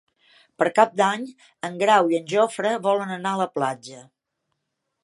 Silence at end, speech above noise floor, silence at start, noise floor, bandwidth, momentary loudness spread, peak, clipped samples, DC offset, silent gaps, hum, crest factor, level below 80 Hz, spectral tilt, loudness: 1 s; 57 dB; 0.6 s; -79 dBFS; 11.5 kHz; 15 LU; -2 dBFS; under 0.1%; under 0.1%; none; none; 22 dB; -80 dBFS; -4.5 dB/octave; -22 LUFS